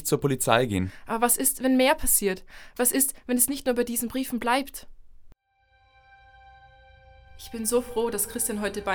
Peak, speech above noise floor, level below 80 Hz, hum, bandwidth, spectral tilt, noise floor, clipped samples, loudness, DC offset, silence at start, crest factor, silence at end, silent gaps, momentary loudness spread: -6 dBFS; 40 dB; -46 dBFS; none; over 20 kHz; -3.5 dB/octave; -65 dBFS; under 0.1%; -24 LUFS; under 0.1%; 0 s; 22 dB; 0 s; none; 10 LU